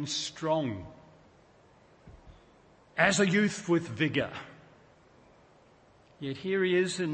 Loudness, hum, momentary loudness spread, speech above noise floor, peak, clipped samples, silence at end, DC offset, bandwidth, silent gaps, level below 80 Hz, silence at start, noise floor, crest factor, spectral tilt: -29 LUFS; none; 17 LU; 31 dB; -8 dBFS; under 0.1%; 0 s; under 0.1%; 8.8 kHz; none; -64 dBFS; 0 s; -60 dBFS; 24 dB; -4.5 dB/octave